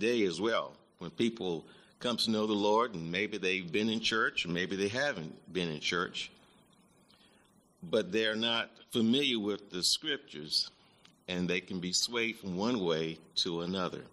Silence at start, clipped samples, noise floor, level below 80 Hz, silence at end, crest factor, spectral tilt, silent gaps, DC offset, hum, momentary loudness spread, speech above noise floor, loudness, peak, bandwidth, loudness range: 0 s; under 0.1%; -66 dBFS; -72 dBFS; 0.05 s; 18 dB; -3.5 dB/octave; none; under 0.1%; none; 9 LU; 33 dB; -32 LUFS; -16 dBFS; 13.5 kHz; 4 LU